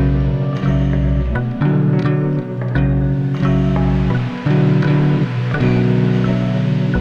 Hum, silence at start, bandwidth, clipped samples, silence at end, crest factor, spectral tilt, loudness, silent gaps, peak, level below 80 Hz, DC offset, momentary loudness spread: none; 0 s; 6.4 kHz; under 0.1%; 0 s; 12 dB; -9.5 dB/octave; -16 LUFS; none; -4 dBFS; -26 dBFS; under 0.1%; 4 LU